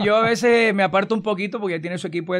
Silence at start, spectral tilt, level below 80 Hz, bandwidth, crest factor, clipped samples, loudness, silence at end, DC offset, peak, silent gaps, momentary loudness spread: 0 s; -5 dB/octave; -64 dBFS; 13.5 kHz; 14 dB; under 0.1%; -20 LUFS; 0 s; under 0.1%; -6 dBFS; none; 10 LU